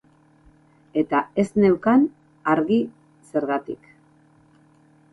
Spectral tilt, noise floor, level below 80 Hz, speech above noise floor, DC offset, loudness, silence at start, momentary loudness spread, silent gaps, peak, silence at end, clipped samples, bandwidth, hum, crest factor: -8 dB/octave; -56 dBFS; -60 dBFS; 36 dB; under 0.1%; -22 LUFS; 0.95 s; 11 LU; none; -6 dBFS; 1.4 s; under 0.1%; 11.5 kHz; none; 18 dB